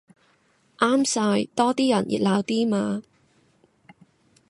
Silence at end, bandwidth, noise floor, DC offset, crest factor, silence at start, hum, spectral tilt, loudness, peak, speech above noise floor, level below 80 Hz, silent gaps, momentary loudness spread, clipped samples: 1.5 s; 11.5 kHz; -63 dBFS; under 0.1%; 18 dB; 0.8 s; none; -4.5 dB/octave; -23 LUFS; -6 dBFS; 41 dB; -68 dBFS; none; 5 LU; under 0.1%